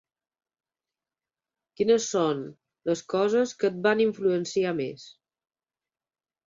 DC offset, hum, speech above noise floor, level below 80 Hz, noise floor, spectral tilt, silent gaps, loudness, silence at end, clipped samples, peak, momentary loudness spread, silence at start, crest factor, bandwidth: under 0.1%; none; over 65 dB; -72 dBFS; under -90 dBFS; -4.5 dB/octave; none; -26 LUFS; 1.35 s; under 0.1%; -8 dBFS; 11 LU; 1.8 s; 20 dB; 7.8 kHz